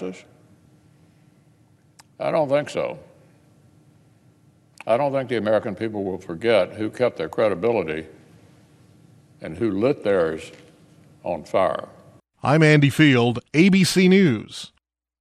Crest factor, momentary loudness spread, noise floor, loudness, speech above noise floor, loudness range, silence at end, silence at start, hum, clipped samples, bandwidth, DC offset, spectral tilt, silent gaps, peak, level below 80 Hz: 20 dB; 19 LU; -57 dBFS; -21 LUFS; 37 dB; 10 LU; 0.55 s; 0 s; none; under 0.1%; 13.5 kHz; under 0.1%; -6 dB/octave; none; -4 dBFS; -60 dBFS